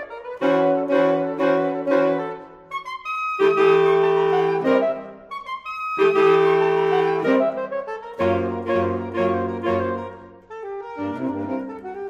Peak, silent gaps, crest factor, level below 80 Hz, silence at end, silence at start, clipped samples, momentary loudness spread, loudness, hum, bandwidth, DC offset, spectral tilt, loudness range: -4 dBFS; none; 16 dB; -60 dBFS; 0 s; 0 s; under 0.1%; 16 LU; -21 LUFS; none; 7.4 kHz; under 0.1%; -7 dB/octave; 5 LU